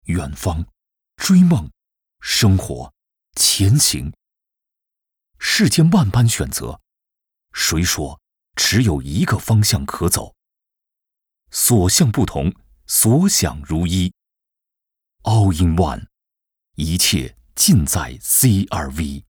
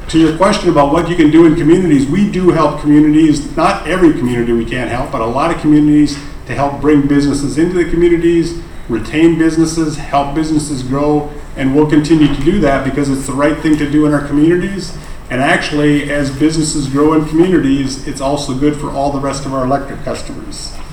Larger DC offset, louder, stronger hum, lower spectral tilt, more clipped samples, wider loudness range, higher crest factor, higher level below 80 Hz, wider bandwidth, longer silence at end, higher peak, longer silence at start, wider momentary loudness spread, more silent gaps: neither; second, -17 LUFS vs -12 LUFS; neither; second, -4 dB/octave vs -6 dB/octave; second, under 0.1% vs 0.1%; about the same, 3 LU vs 4 LU; about the same, 16 dB vs 12 dB; second, -36 dBFS vs -28 dBFS; first, over 20 kHz vs 12.5 kHz; about the same, 0.1 s vs 0 s; about the same, -2 dBFS vs 0 dBFS; about the same, 0.05 s vs 0 s; first, 15 LU vs 10 LU; neither